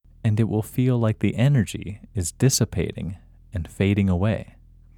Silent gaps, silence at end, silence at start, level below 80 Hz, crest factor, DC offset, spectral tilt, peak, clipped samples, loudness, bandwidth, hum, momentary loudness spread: none; 0.55 s; 0.25 s; -44 dBFS; 16 dB; under 0.1%; -6 dB/octave; -6 dBFS; under 0.1%; -23 LUFS; 18.5 kHz; none; 14 LU